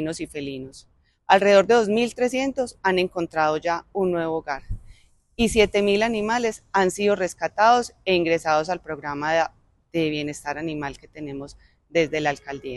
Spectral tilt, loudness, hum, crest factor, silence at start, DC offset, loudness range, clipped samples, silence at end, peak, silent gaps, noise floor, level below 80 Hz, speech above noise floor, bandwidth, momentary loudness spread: -4.5 dB/octave; -22 LUFS; none; 20 dB; 0 s; under 0.1%; 6 LU; under 0.1%; 0 s; -2 dBFS; none; -51 dBFS; -46 dBFS; 28 dB; 12.5 kHz; 16 LU